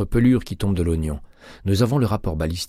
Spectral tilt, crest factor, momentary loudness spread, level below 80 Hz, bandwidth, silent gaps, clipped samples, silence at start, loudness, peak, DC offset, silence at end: -7 dB/octave; 14 dB; 11 LU; -32 dBFS; 15.5 kHz; none; under 0.1%; 0 s; -22 LUFS; -6 dBFS; under 0.1%; 0 s